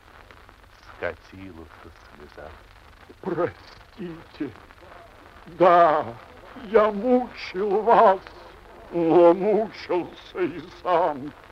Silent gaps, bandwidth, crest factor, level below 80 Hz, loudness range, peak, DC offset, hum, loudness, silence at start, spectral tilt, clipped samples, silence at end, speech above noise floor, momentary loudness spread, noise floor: none; 7.2 kHz; 20 dB; -54 dBFS; 15 LU; -4 dBFS; under 0.1%; none; -22 LUFS; 1 s; -7.5 dB/octave; under 0.1%; 0.2 s; 27 dB; 26 LU; -50 dBFS